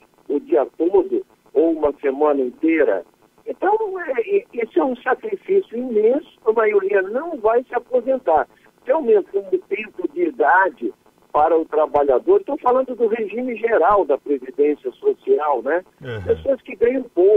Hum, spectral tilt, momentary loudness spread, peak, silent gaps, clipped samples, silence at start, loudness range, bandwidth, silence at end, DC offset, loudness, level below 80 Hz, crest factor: none; -8 dB/octave; 8 LU; -4 dBFS; none; under 0.1%; 0.3 s; 2 LU; 3.9 kHz; 0 s; under 0.1%; -19 LUFS; -54 dBFS; 14 dB